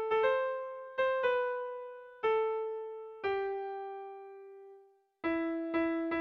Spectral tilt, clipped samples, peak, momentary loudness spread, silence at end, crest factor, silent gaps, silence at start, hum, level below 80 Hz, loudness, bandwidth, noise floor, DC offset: -6 dB/octave; under 0.1%; -20 dBFS; 17 LU; 0 s; 16 dB; none; 0 s; none; -72 dBFS; -34 LUFS; 6 kHz; -61 dBFS; under 0.1%